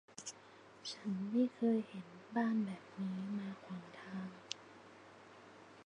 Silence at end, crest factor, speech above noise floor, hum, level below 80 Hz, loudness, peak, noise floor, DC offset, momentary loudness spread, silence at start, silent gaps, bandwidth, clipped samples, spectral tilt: 0.05 s; 24 dB; 21 dB; none; -86 dBFS; -41 LUFS; -18 dBFS; -60 dBFS; under 0.1%; 22 LU; 0.1 s; none; 10.5 kHz; under 0.1%; -5.5 dB/octave